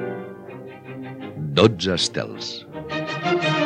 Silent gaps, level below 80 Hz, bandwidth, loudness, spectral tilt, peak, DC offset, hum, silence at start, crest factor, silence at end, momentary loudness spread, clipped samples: none; -56 dBFS; 10.5 kHz; -22 LUFS; -5 dB/octave; -2 dBFS; under 0.1%; none; 0 s; 22 dB; 0 s; 19 LU; under 0.1%